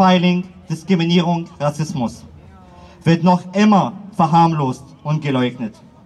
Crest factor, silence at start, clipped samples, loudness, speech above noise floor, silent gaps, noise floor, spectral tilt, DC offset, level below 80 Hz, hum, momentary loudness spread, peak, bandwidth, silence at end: 14 dB; 0 s; under 0.1%; -17 LUFS; 25 dB; none; -42 dBFS; -7 dB/octave; under 0.1%; -52 dBFS; none; 12 LU; -2 dBFS; 10.5 kHz; 0.35 s